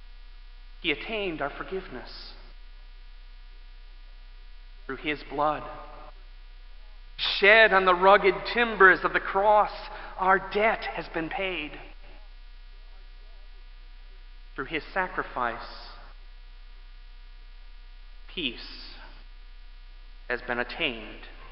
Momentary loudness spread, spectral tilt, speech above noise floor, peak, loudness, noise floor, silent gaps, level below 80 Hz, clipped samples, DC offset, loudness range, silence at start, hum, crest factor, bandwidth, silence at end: 25 LU; -7.5 dB/octave; 20 dB; -4 dBFS; -24 LUFS; -45 dBFS; none; -46 dBFS; under 0.1%; 0.1%; 19 LU; 0 s; none; 26 dB; 5.8 kHz; 0 s